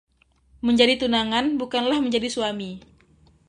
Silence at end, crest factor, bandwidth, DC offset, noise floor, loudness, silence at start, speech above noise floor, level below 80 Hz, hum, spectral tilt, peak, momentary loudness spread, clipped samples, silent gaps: 0.7 s; 22 dB; 11 kHz; under 0.1%; -59 dBFS; -22 LUFS; 0.65 s; 37 dB; -54 dBFS; none; -4 dB/octave; -2 dBFS; 13 LU; under 0.1%; none